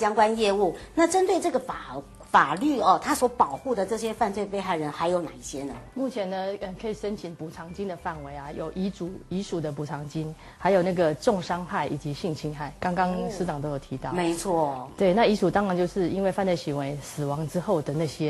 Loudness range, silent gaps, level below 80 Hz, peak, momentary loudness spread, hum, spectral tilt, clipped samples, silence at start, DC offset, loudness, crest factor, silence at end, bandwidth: 9 LU; none; -52 dBFS; -6 dBFS; 13 LU; none; -5.5 dB/octave; under 0.1%; 0 s; under 0.1%; -27 LUFS; 20 dB; 0 s; 12.5 kHz